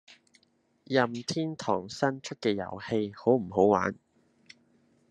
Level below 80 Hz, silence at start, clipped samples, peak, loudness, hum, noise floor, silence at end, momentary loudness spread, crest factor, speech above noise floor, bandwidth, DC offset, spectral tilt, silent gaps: -72 dBFS; 0.1 s; under 0.1%; -8 dBFS; -29 LUFS; none; -69 dBFS; 1.15 s; 8 LU; 22 dB; 41 dB; 10.5 kHz; under 0.1%; -5.5 dB/octave; none